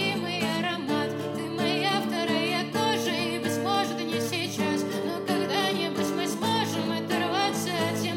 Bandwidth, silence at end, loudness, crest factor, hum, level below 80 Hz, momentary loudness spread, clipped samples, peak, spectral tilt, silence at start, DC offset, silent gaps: 16.5 kHz; 0 s; -27 LUFS; 14 dB; none; -76 dBFS; 3 LU; under 0.1%; -12 dBFS; -4 dB/octave; 0 s; under 0.1%; none